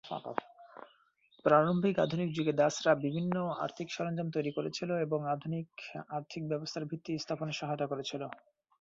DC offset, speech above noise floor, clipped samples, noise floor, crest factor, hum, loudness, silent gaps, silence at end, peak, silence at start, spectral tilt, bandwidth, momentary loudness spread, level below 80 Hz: under 0.1%; 35 dB; under 0.1%; -68 dBFS; 22 dB; none; -34 LUFS; none; 0.45 s; -12 dBFS; 0.05 s; -6 dB/octave; 7.8 kHz; 14 LU; -74 dBFS